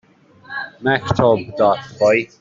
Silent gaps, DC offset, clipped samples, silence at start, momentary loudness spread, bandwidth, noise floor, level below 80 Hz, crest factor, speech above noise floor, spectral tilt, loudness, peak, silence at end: none; under 0.1%; under 0.1%; 0.5 s; 13 LU; 7.6 kHz; -45 dBFS; -48 dBFS; 16 dB; 28 dB; -6.5 dB/octave; -17 LUFS; -2 dBFS; 0.15 s